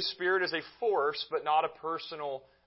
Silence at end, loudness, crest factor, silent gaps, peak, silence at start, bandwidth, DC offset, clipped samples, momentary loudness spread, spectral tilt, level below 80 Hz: 0.25 s; -32 LUFS; 16 dB; none; -16 dBFS; 0 s; 5.8 kHz; under 0.1%; under 0.1%; 9 LU; -6.5 dB/octave; -76 dBFS